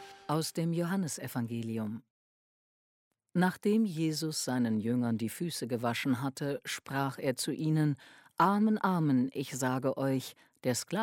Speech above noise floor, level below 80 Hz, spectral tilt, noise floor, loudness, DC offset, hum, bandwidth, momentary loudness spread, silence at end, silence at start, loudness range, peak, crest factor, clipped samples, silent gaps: over 59 dB; -76 dBFS; -5.5 dB/octave; under -90 dBFS; -32 LUFS; under 0.1%; none; 16.5 kHz; 8 LU; 0 s; 0 s; 4 LU; -14 dBFS; 18 dB; under 0.1%; 2.10-3.11 s